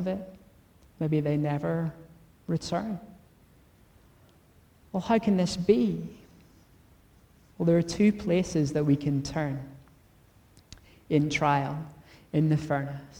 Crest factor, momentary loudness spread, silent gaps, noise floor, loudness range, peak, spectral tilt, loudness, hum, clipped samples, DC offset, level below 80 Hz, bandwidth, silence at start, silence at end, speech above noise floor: 20 dB; 13 LU; none; -59 dBFS; 5 LU; -10 dBFS; -7 dB/octave; -28 LUFS; none; under 0.1%; under 0.1%; -56 dBFS; 11.5 kHz; 0 s; 0 s; 33 dB